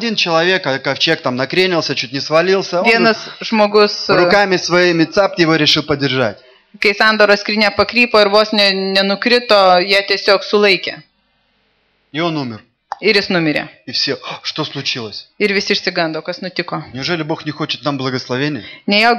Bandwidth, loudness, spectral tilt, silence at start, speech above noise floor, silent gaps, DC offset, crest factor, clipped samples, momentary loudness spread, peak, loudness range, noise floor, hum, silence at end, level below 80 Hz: 14 kHz; -14 LUFS; -4.5 dB/octave; 0 s; 46 dB; none; under 0.1%; 14 dB; under 0.1%; 11 LU; 0 dBFS; 7 LU; -61 dBFS; none; 0 s; -54 dBFS